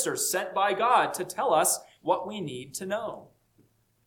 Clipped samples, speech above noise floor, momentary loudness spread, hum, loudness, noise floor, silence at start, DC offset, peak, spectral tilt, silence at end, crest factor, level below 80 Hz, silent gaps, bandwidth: under 0.1%; 38 dB; 13 LU; none; -27 LUFS; -66 dBFS; 0 s; under 0.1%; -8 dBFS; -2.5 dB/octave; 0.85 s; 20 dB; -72 dBFS; none; 19 kHz